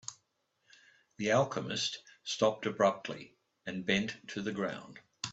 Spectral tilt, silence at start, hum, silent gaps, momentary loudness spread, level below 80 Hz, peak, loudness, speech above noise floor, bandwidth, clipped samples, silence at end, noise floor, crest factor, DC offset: -4 dB/octave; 0.1 s; none; none; 16 LU; -72 dBFS; -14 dBFS; -34 LUFS; 45 dB; 8.2 kHz; under 0.1%; 0 s; -78 dBFS; 20 dB; under 0.1%